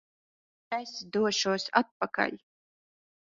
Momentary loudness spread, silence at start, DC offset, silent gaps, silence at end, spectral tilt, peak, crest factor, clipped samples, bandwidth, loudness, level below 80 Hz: 9 LU; 0.7 s; under 0.1%; 1.91-2.00 s; 0.9 s; -3 dB/octave; -6 dBFS; 26 dB; under 0.1%; 7.8 kHz; -30 LUFS; -76 dBFS